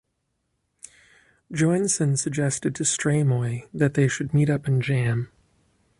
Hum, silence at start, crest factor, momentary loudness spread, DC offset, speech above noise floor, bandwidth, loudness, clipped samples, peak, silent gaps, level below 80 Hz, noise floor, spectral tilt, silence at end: none; 0.85 s; 18 dB; 5 LU; under 0.1%; 53 dB; 11.5 kHz; -23 LUFS; under 0.1%; -6 dBFS; none; -58 dBFS; -75 dBFS; -5.5 dB/octave; 0.75 s